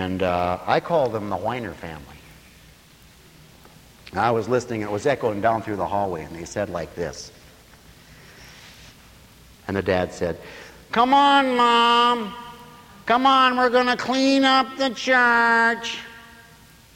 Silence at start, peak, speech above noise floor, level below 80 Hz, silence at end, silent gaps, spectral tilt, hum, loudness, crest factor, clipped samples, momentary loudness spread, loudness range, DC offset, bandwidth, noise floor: 0 s; -4 dBFS; 30 dB; -54 dBFS; 0.7 s; none; -4.5 dB/octave; none; -20 LUFS; 18 dB; under 0.1%; 18 LU; 13 LU; under 0.1%; 16.5 kHz; -50 dBFS